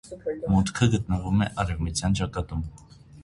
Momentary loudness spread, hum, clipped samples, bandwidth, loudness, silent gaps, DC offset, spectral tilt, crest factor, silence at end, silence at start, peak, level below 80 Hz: 10 LU; none; under 0.1%; 11.5 kHz; -26 LUFS; none; under 0.1%; -6 dB/octave; 18 dB; 0 s; 0.05 s; -8 dBFS; -38 dBFS